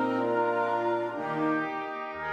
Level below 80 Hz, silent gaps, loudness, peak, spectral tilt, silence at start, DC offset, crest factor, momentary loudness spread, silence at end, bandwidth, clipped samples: -70 dBFS; none; -29 LUFS; -16 dBFS; -7 dB/octave; 0 s; under 0.1%; 12 dB; 7 LU; 0 s; 9 kHz; under 0.1%